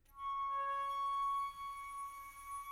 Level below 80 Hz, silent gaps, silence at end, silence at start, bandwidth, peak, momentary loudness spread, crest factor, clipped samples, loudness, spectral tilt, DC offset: -68 dBFS; none; 0 s; 0.1 s; 16.5 kHz; -32 dBFS; 11 LU; 8 dB; under 0.1%; -41 LUFS; -1 dB/octave; under 0.1%